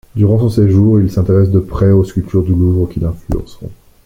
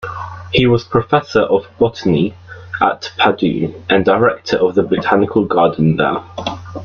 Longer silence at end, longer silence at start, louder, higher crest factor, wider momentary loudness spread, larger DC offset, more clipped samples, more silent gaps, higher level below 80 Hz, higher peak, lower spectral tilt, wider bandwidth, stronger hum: first, 0.3 s vs 0 s; first, 0.15 s vs 0 s; about the same, -13 LUFS vs -15 LUFS; about the same, 10 dB vs 14 dB; first, 12 LU vs 9 LU; neither; neither; neither; first, -30 dBFS vs -44 dBFS; about the same, -2 dBFS vs 0 dBFS; first, -10 dB/octave vs -7 dB/octave; about the same, 7.6 kHz vs 7 kHz; neither